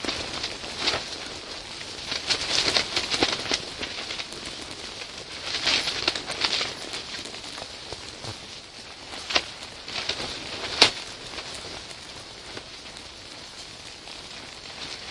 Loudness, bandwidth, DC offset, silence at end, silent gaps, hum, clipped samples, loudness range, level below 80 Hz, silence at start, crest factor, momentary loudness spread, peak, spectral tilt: -27 LUFS; 12 kHz; under 0.1%; 0 s; none; none; under 0.1%; 11 LU; -54 dBFS; 0 s; 30 dB; 16 LU; 0 dBFS; -1 dB/octave